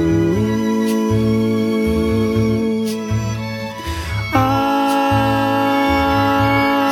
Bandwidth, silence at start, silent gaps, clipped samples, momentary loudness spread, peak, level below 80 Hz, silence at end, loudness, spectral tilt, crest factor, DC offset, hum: 18 kHz; 0 s; none; under 0.1%; 8 LU; -2 dBFS; -34 dBFS; 0 s; -17 LUFS; -6.5 dB/octave; 14 dB; under 0.1%; none